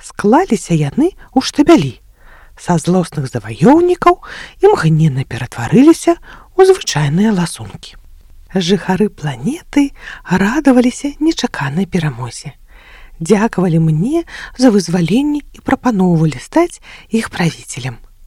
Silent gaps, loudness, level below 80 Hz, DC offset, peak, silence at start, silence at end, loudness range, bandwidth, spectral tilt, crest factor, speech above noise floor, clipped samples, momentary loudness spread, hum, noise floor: none; -14 LUFS; -40 dBFS; under 0.1%; 0 dBFS; 0.05 s; 0.2 s; 4 LU; 14.5 kHz; -6 dB/octave; 14 dB; 27 dB; 0.2%; 13 LU; none; -40 dBFS